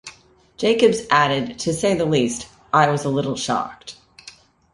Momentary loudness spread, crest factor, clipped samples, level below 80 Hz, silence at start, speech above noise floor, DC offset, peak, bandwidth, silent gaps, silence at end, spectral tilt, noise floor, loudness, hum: 17 LU; 18 dB; under 0.1%; -54 dBFS; 0.05 s; 31 dB; under 0.1%; -2 dBFS; 11.5 kHz; none; 0.45 s; -4.5 dB/octave; -50 dBFS; -19 LUFS; none